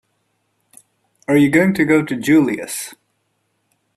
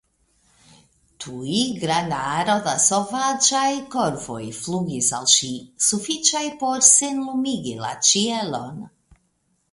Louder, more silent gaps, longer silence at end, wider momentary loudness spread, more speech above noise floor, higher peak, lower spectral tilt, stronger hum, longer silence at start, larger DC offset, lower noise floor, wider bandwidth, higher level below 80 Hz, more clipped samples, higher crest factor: first, -16 LUFS vs -19 LUFS; neither; first, 1.05 s vs 0.85 s; about the same, 14 LU vs 15 LU; first, 53 dB vs 47 dB; about the same, -2 dBFS vs 0 dBFS; first, -5.5 dB/octave vs -2 dB/octave; neither; about the same, 1.3 s vs 1.2 s; neither; about the same, -68 dBFS vs -68 dBFS; first, 13 kHz vs 11.5 kHz; about the same, -58 dBFS vs -60 dBFS; neither; about the same, 18 dB vs 22 dB